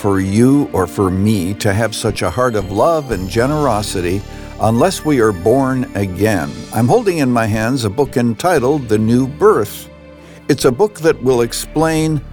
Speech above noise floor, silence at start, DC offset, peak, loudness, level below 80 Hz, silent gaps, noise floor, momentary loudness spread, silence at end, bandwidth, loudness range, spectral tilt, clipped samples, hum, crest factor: 23 dB; 0 s; under 0.1%; -2 dBFS; -15 LUFS; -36 dBFS; none; -37 dBFS; 6 LU; 0 s; over 20 kHz; 1 LU; -6 dB/octave; under 0.1%; none; 14 dB